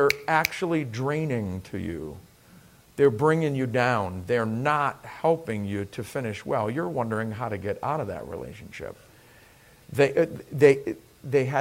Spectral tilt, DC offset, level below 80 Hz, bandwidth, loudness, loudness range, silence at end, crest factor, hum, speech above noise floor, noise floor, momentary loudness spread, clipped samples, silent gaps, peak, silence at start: -6.5 dB/octave; under 0.1%; -58 dBFS; 16 kHz; -26 LUFS; 6 LU; 0 s; 24 dB; none; 28 dB; -54 dBFS; 16 LU; under 0.1%; none; -2 dBFS; 0 s